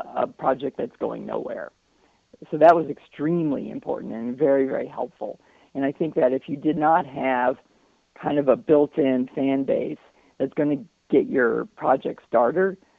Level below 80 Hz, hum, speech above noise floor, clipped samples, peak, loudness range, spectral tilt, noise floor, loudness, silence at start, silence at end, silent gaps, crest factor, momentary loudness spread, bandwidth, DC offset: -64 dBFS; none; 40 dB; under 0.1%; -4 dBFS; 3 LU; -9 dB/octave; -63 dBFS; -23 LUFS; 0 s; 0.25 s; none; 20 dB; 13 LU; 6.6 kHz; under 0.1%